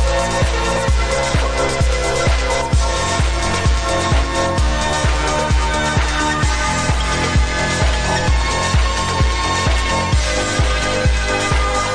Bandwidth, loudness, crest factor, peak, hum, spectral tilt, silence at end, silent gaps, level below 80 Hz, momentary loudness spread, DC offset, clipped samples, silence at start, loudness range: 11 kHz; -17 LUFS; 12 dB; -4 dBFS; none; -4 dB/octave; 0 s; none; -20 dBFS; 1 LU; under 0.1%; under 0.1%; 0 s; 0 LU